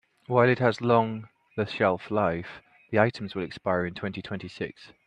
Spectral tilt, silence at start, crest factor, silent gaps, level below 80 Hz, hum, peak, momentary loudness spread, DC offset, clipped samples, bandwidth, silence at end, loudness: -7.5 dB/octave; 0.3 s; 22 dB; none; -64 dBFS; none; -4 dBFS; 14 LU; under 0.1%; under 0.1%; 9.4 kHz; 0.2 s; -27 LUFS